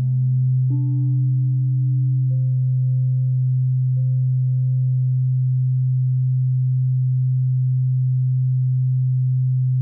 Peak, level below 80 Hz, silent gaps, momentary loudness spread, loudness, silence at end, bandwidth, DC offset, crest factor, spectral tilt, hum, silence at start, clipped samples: -14 dBFS; -68 dBFS; none; 0 LU; -20 LUFS; 0 s; 0.6 kHz; under 0.1%; 4 dB; -19.5 dB/octave; none; 0 s; under 0.1%